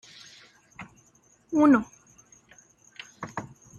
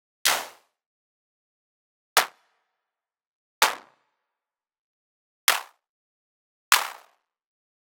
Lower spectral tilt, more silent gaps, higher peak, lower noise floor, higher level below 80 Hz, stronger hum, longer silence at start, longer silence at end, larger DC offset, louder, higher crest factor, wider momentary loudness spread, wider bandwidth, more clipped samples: first, -6 dB/octave vs 2.5 dB/octave; second, none vs 0.86-2.16 s, 3.27-3.61 s, 4.79-5.47 s, 5.89-6.71 s; second, -8 dBFS vs 0 dBFS; second, -62 dBFS vs -90 dBFS; first, -66 dBFS vs -78 dBFS; neither; first, 0.8 s vs 0.25 s; second, 0.35 s vs 1.05 s; neither; about the same, -24 LUFS vs -24 LUFS; second, 22 dB vs 32 dB; first, 27 LU vs 13 LU; second, 7.6 kHz vs 17.5 kHz; neither